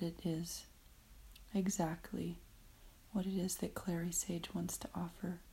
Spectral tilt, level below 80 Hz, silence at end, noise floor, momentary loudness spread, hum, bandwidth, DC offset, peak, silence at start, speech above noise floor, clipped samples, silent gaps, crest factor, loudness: -5 dB/octave; -60 dBFS; 0 s; -61 dBFS; 13 LU; none; 16 kHz; under 0.1%; -24 dBFS; 0 s; 20 dB; under 0.1%; none; 18 dB; -41 LUFS